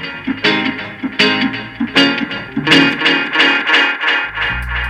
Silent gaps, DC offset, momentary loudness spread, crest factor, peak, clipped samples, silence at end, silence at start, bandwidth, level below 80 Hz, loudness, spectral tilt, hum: none; under 0.1%; 11 LU; 16 dB; 0 dBFS; under 0.1%; 0 s; 0 s; 13 kHz; -36 dBFS; -13 LUFS; -4 dB/octave; none